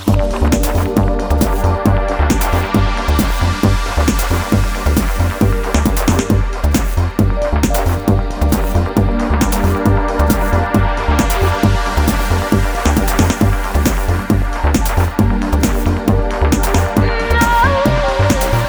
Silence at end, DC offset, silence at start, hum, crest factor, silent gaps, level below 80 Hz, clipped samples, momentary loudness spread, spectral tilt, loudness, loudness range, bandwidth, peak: 0 s; under 0.1%; 0 s; none; 12 dB; none; -18 dBFS; under 0.1%; 2 LU; -6 dB/octave; -15 LUFS; 1 LU; over 20 kHz; 0 dBFS